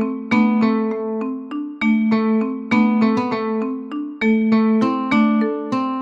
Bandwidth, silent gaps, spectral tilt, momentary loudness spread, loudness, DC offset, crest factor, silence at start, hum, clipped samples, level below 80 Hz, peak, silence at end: 7.2 kHz; none; -7.5 dB/octave; 9 LU; -19 LUFS; under 0.1%; 14 dB; 0 s; none; under 0.1%; -58 dBFS; -4 dBFS; 0 s